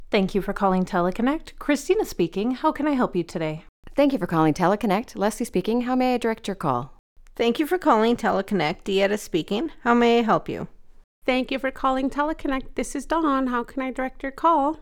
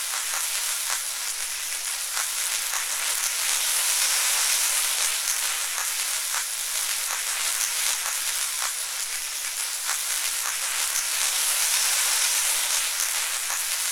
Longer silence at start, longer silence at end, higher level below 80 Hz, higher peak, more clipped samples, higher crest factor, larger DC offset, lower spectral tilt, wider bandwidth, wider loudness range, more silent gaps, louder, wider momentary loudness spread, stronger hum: about the same, 0 s vs 0 s; about the same, 0 s vs 0 s; first, -44 dBFS vs -64 dBFS; about the same, -6 dBFS vs -4 dBFS; neither; about the same, 18 dB vs 22 dB; neither; first, -5.5 dB/octave vs 5 dB/octave; about the same, 18.5 kHz vs over 20 kHz; about the same, 3 LU vs 3 LU; first, 3.69-3.83 s, 6.99-7.16 s, 11.04-11.22 s vs none; about the same, -23 LUFS vs -23 LUFS; about the same, 9 LU vs 7 LU; neither